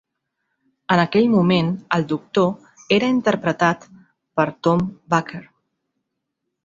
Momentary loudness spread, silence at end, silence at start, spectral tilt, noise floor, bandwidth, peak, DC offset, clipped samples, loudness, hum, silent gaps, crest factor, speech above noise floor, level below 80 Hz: 13 LU; 1.25 s; 0.9 s; -6.5 dB/octave; -78 dBFS; 7.6 kHz; -2 dBFS; under 0.1%; under 0.1%; -20 LUFS; none; none; 20 dB; 59 dB; -58 dBFS